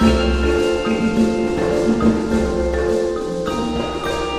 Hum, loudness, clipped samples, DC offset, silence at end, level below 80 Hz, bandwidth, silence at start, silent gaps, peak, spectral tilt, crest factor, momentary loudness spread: none; -19 LUFS; under 0.1%; under 0.1%; 0 s; -28 dBFS; 12.5 kHz; 0 s; none; -2 dBFS; -6 dB/octave; 16 dB; 6 LU